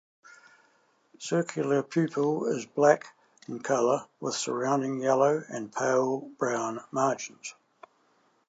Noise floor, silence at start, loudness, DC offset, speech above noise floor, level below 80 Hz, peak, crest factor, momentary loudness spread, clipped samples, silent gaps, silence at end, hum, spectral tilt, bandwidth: -68 dBFS; 0.3 s; -28 LUFS; under 0.1%; 40 dB; -84 dBFS; -8 dBFS; 22 dB; 12 LU; under 0.1%; none; 0.95 s; none; -5 dB/octave; 9.2 kHz